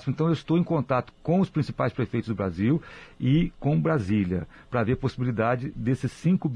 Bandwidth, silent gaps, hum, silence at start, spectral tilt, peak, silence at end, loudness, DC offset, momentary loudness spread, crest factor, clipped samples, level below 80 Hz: 10 kHz; none; none; 0 s; -8.5 dB/octave; -12 dBFS; 0 s; -26 LUFS; under 0.1%; 5 LU; 14 dB; under 0.1%; -48 dBFS